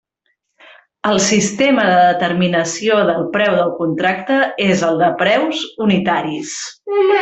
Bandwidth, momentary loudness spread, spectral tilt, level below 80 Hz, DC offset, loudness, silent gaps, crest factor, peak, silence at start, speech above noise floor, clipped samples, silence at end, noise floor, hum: 8.4 kHz; 8 LU; -4 dB/octave; -56 dBFS; under 0.1%; -15 LUFS; none; 14 dB; -2 dBFS; 1.05 s; 53 dB; under 0.1%; 0 s; -68 dBFS; none